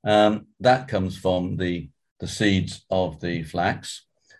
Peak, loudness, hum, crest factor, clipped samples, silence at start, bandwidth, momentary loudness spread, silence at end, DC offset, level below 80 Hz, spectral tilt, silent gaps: -4 dBFS; -24 LUFS; none; 18 dB; under 0.1%; 0.05 s; 12.5 kHz; 13 LU; 0.4 s; under 0.1%; -46 dBFS; -5.5 dB/octave; 2.11-2.16 s